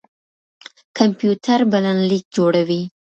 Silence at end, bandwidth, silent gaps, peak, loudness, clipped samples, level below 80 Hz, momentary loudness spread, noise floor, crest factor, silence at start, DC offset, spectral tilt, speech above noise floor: 0.2 s; 8.2 kHz; 2.25-2.31 s; 0 dBFS; -17 LUFS; under 0.1%; -66 dBFS; 4 LU; under -90 dBFS; 18 dB; 0.95 s; under 0.1%; -6.5 dB/octave; over 73 dB